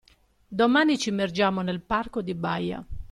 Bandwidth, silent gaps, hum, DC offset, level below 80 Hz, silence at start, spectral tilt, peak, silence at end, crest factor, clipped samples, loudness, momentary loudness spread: 12.5 kHz; none; none; under 0.1%; -48 dBFS; 0.5 s; -5 dB/octave; -10 dBFS; 0.05 s; 16 dB; under 0.1%; -25 LUFS; 11 LU